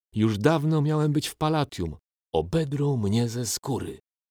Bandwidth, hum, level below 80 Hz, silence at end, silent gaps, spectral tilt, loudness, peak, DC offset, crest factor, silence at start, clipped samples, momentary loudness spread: 18 kHz; none; -50 dBFS; 0.35 s; none; -6 dB/octave; -26 LUFS; -8 dBFS; under 0.1%; 18 dB; 0.15 s; under 0.1%; 9 LU